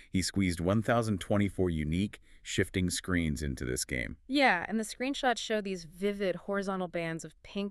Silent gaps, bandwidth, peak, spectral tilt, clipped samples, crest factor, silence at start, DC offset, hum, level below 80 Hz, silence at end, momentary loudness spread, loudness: none; 13.5 kHz; -12 dBFS; -5 dB/octave; under 0.1%; 18 dB; 0 s; under 0.1%; none; -48 dBFS; 0 s; 8 LU; -32 LUFS